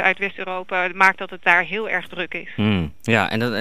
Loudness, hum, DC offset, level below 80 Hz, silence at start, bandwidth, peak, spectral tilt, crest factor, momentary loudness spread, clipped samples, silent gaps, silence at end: -20 LUFS; none; 1%; -48 dBFS; 0 s; 15.5 kHz; -2 dBFS; -5.5 dB/octave; 20 dB; 10 LU; under 0.1%; none; 0 s